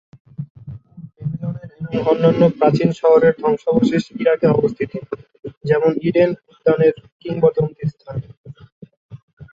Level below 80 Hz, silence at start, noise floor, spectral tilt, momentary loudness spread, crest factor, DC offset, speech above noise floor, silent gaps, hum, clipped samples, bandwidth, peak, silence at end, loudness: -52 dBFS; 0.4 s; -38 dBFS; -8.5 dB/octave; 19 LU; 16 dB; under 0.1%; 21 dB; 0.50-0.55 s, 5.57-5.61 s, 7.12-7.20 s, 8.37-8.44 s, 8.72-8.81 s, 8.97-9.09 s, 9.22-9.37 s; none; under 0.1%; 7.6 kHz; -2 dBFS; 0.1 s; -17 LUFS